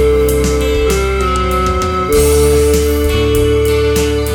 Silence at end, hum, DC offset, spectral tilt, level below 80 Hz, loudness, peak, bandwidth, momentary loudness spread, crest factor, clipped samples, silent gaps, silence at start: 0 s; none; under 0.1%; -5 dB/octave; -18 dBFS; -12 LUFS; 0 dBFS; over 20 kHz; 4 LU; 12 dB; under 0.1%; none; 0 s